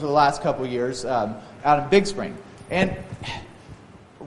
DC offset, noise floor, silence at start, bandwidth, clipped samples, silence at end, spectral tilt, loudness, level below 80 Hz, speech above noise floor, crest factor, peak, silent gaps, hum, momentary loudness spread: under 0.1%; -45 dBFS; 0 s; 11.5 kHz; under 0.1%; 0 s; -5.5 dB/octave; -23 LUFS; -50 dBFS; 23 dB; 20 dB; -4 dBFS; none; none; 15 LU